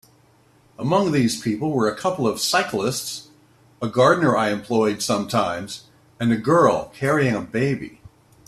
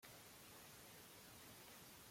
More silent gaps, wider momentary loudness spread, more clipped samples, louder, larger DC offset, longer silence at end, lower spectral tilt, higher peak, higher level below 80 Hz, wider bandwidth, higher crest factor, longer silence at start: neither; first, 13 LU vs 1 LU; neither; first, -21 LUFS vs -60 LUFS; neither; first, 0.6 s vs 0 s; first, -5 dB/octave vs -2.5 dB/octave; first, -2 dBFS vs -44 dBFS; first, -58 dBFS vs -82 dBFS; second, 14.5 kHz vs 16.5 kHz; about the same, 18 dB vs 18 dB; first, 0.8 s vs 0 s